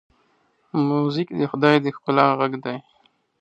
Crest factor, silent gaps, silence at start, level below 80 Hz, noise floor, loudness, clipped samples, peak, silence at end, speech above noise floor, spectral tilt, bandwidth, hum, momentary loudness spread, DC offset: 22 dB; none; 0.75 s; -70 dBFS; -64 dBFS; -21 LUFS; under 0.1%; 0 dBFS; 0.6 s; 44 dB; -8 dB/octave; 7.8 kHz; none; 12 LU; under 0.1%